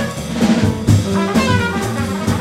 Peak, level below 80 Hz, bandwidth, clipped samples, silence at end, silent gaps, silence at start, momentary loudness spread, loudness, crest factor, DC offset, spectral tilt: -2 dBFS; -34 dBFS; 15.5 kHz; under 0.1%; 0 s; none; 0 s; 5 LU; -16 LUFS; 14 dB; under 0.1%; -6 dB/octave